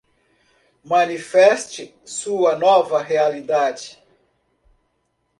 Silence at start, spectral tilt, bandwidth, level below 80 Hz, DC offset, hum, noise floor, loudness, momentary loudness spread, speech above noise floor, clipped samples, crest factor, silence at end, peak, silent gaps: 0.85 s; -3 dB/octave; 11.5 kHz; -68 dBFS; under 0.1%; none; -69 dBFS; -18 LUFS; 17 LU; 52 dB; under 0.1%; 20 dB; 1.5 s; 0 dBFS; none